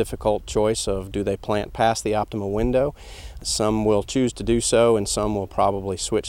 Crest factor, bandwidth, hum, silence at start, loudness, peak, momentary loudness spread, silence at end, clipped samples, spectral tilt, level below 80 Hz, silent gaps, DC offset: 18 dB; 16.5 kHz; none; 0 s; -22 LUFS; -4 dBFS; 7 LU; 0 s; under 0.1%; -4.5 dB/octave; -38 dBFS; none; under 0.1%